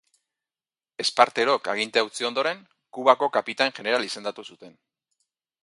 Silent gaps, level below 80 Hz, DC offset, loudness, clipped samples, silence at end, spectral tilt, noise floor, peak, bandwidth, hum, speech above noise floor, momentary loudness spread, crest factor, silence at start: none; -78 dBFS; under 0.1%; -24 LUFS; under 0.1%; 0.95 s; -2 dB/octave; under -90 dBFS; -2 dBFS; 11.5 kHz; none; over 66 dB; 18 LU; 24 dB; 1 s